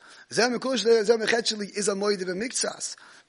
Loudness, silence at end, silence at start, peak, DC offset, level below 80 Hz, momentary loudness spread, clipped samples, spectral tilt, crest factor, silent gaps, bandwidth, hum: -25 LUFS; 0.35 s; 0.1 s; -6 dBFS; under 0.1%; -74 dBFS; 8 LU; under 0.1%; -2.5 dB/octave; 20 dB; none; 11 kHz; none